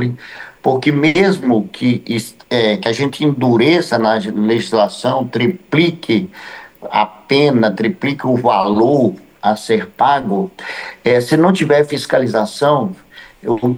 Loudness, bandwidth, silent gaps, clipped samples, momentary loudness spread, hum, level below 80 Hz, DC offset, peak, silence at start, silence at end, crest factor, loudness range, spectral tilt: -15 LUFS; over 20 kHz; none; under 0.1%; 10 LU; none; -56 dBFS; under 0.1%; -2 dBFS; 0 s; 0 s; 14 dB; 1 LU; -6 dB/octave